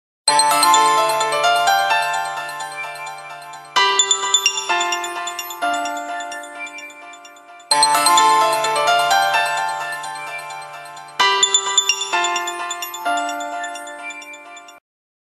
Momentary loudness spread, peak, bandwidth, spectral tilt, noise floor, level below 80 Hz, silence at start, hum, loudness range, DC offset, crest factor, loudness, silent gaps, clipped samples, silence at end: 18 LU; 0 dBFS; 13 kHz; 0.5 dB/octave; -41 dBFS; -72 dBFS; 0.25 s; none; 5 LU; under 0.1%; 20 dB; -17 LUFS; none; under 0.1%; 0.5 s